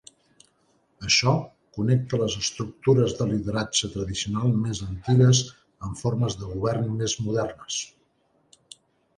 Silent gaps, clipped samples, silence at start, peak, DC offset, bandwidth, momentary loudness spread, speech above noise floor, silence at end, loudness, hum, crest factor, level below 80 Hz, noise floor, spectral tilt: none; under 0.1%; 1 s; -8 dBFS; under 0.1%; 10.5 kHz; 11 LU; 43 dB; 1.3 s; -24 LUFS; none; 18 dB; -50 dBFS; -67 dBFS; -5 dB/octave